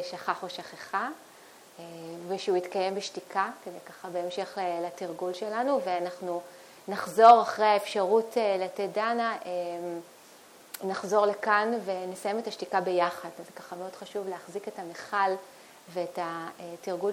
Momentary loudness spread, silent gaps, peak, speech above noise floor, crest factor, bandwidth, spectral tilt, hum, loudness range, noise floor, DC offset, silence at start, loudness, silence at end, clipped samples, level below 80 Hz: 16 LU; none; -4 dBFS; 25 dB; 26 dB; 16.5 kHz; -4 dB/octave; none; 9 LU; -53 dBFS; under 0.1%; 0 s; -29 LUFS; 0 s; under 0.1%; -84 dBFS